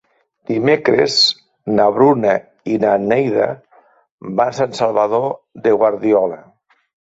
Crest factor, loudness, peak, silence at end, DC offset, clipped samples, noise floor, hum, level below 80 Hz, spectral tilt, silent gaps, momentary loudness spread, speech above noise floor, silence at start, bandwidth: 16 dB; -16 LUFS; 0 dBFS; 0.75 s; under 0.1%; under 0.1%; -52 dBFS; none; -58 dBFS; -5 dB/octave; 4.11-4.18 s; 11 LU; 37 dB; 0.5 s; 8 kHz